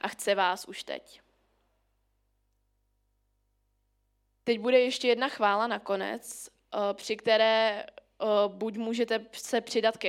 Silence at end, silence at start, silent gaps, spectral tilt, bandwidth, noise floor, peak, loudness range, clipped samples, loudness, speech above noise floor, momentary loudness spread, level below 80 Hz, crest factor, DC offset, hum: 0 s; 0.05 s; none; -3 dB/octave; 16 kHz; -74 dBFS; -10 dBFS; 12 LU; under 0.1%; -28 LUFS; 46 dB; 14 LU; -74 dBFS; 20 dB; under 0.1%; 50 Hz at -70 dBFS